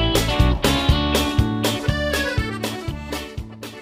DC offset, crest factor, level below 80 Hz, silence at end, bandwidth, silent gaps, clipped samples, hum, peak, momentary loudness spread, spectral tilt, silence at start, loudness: under 0.1%; 16 dB; -26 dBFS; 0 s; 16 kHz; none; under 0.1%; none; -4 dBFS; 12 LU; -5 dB/octave; 0 s; -21 LUFS